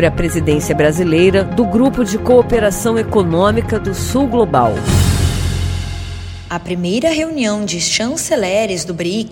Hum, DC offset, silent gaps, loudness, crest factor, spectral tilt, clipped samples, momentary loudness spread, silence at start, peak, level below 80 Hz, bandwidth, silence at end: none; under 0.1%; none; -15 LUFS; 14 dB; -5 dB/octave; under 0.1%; 8 LU; 0 s; 0 dBFS; -28 dBFS; 18 kHz; 0 s